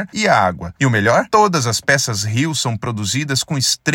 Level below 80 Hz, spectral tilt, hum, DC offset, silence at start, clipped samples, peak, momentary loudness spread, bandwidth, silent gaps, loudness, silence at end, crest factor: -52 dBFS; -3.5 dB/octave; none; under 0.1%; 0 s; under 0.1%; 0 dBFS; 6 LU; 17 kHz; none; -16 LUFS; 0 s; 16 dB